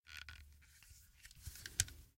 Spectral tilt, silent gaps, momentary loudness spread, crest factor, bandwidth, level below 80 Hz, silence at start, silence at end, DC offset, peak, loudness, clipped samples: -0.5 dB/octave; none; 23 LU; 36 dB; 16.5 kHz; -60 dBFS; 0.05 s; 0.05 s; under 0.1%; -14 dBFS; -44 LUFS; under 0.1%